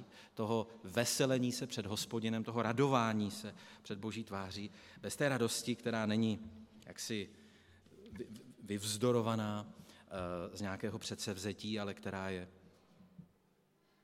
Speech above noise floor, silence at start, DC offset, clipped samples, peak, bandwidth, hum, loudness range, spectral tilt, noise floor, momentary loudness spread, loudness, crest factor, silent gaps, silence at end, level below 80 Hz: 36 dB; 0 s; under 0.1%; under 0.1%; -16 dBFS; 16.5 kHz; none; 7 LU; -4.5 dB/octave; -74 dBFS; 17 LU; -38 LUFS; 22 dB; none; 0.8 s; -76 dBFS